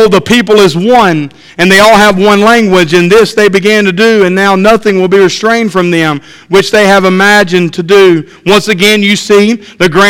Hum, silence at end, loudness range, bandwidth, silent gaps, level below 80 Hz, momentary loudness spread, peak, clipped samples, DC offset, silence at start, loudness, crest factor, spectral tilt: none; 0 s; 2 LU; 16.5 kHz; none; -38 dBFS; 6 LU; 0 dBFS; 5%; under 0.1%; 0 s; -6 LUFS; 6 dB; -4.5 dB/octave